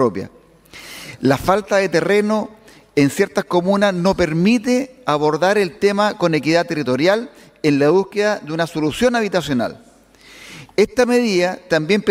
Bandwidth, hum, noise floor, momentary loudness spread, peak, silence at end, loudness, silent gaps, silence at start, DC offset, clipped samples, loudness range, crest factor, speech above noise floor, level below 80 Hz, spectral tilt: 16 kHz; none; -46 dBFS; 9 LU; 0 dBFS; 0 s; -17 LUFS; none; 0 s; under 0.1%; under 0.1%; 2 LU; 18 dB; 29 dB; -48 dBFS; -5.5 dB/octave